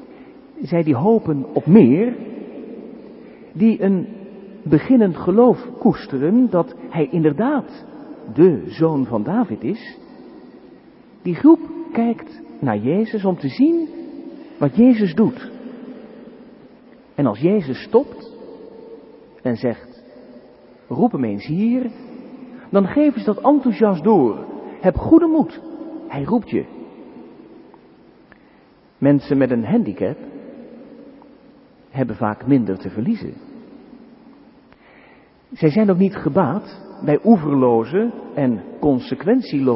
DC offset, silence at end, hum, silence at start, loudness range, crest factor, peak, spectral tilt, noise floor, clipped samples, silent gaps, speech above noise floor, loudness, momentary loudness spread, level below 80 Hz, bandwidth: under 0.1%; 0 s; none; 0 s; 7 LU; 18 dB; 0 dBFS; -13 dB/octave; -51 dBFS; under 0.1%; none; 34 dB; -18 LUFS; 22 LU; -50 dBFS; 5.8 kHz